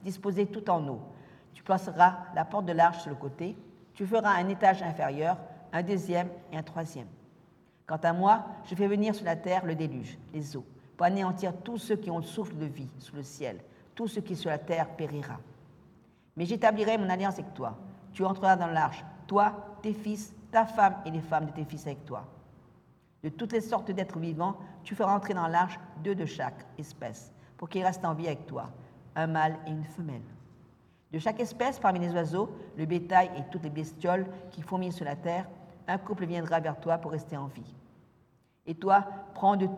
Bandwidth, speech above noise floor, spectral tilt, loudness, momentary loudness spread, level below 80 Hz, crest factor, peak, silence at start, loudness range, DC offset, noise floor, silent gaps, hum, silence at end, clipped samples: 14 kHz; 36 dB; -6.5 dB/octave; -31 LUFS; 17 LU; -70 dBFS; 22 dB; -8 dBFS; 0 s; 7 LU; under 0.1%; -66 dBFS; none; none; 0 s; under 0.1%